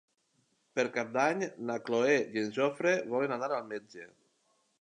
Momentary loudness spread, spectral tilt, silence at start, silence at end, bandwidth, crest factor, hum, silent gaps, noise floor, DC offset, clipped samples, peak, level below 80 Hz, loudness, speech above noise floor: 12 LU; -4.5 dB/octave; 0.75 s; 0.75 s; 10 kHz; 20 dB; none; none; -75 dBFS; under 0.1%; under 0.1%; -14 dBFS; -86 dBFS; -31 LUFS; 43 dB